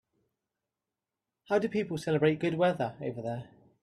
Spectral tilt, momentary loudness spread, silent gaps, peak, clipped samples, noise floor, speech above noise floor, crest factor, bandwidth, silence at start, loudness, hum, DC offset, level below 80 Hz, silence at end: -7 dB/octave; 10 LU; none; -12 dBFS; under 0.1%; -89 dBFS; 60 dB; 20 dB; 12.5 kHz; 1.5 s; -30 LUFS; none; under 0.1%; -70 dBFS; 0.35 s